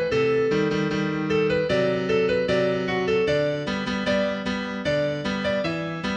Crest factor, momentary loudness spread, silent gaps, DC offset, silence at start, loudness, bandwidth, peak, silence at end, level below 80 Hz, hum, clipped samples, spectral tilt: 12 dB; 5 LU; none; under 0.1%; 0 s; -24 LUFS; 9.2 kHz; -10 dBFS; 0 s; -50 dBFS; none; under 0.1%; -6 dB/octave